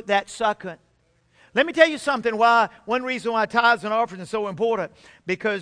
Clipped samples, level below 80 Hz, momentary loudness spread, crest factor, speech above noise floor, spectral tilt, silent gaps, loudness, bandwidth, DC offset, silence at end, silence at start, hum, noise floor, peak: under 0.1%; -62 dBFS; 11 LU; 20 dB; 42 dB; -4 dB/octave; none; -22 LUFS; 10.5 kHz; under 0.1%; 0 s; 0.05 s; none; -64 dBFS; -2 dBFS